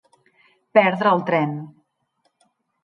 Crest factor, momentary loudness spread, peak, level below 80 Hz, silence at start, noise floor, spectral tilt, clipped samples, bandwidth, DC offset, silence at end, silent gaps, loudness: 20 dB; 16 LU; -2 dBFS; -74 dBFS; 0.75 s; -70 dBFS; -8 dB/octave; under 0.1%; 6 kHz; under 0.1%; 1.15 s; none; -19 LUFS